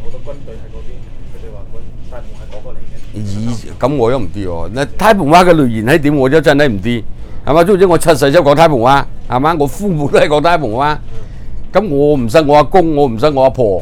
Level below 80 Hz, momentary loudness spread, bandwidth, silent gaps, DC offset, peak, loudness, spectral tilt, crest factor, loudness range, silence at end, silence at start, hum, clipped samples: -26 dBFS; 23 LU; 16 kHz; none; under 0.1%; 0 dBFS; -11 LUFS; -6 dB/octave; 12 dB; 11 LU; 0 s; 0 s; none; 1%